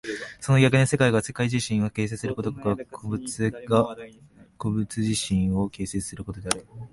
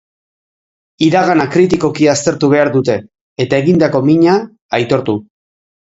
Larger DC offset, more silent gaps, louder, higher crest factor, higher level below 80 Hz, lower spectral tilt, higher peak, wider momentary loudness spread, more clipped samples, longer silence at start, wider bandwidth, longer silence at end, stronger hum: neither; second, none vs 3.21-3.36 s, 4.61-4.69 s; second, -25 LUFS vs -13 LUFS; first, 20 dB vs 14 dB; about the same, -48 dBFS vs -50 dBFS; about the same, -5.5 dB/octave vs -6 dB/octave; second, -4 dBFS vs 0 dBFS; first, 13 LU vs 9 LU; neither; second, 0.05 s vs 1 s; first, 11.5 kHz vs 8 kHz; second, 0.05 s vs 0.75 s; neither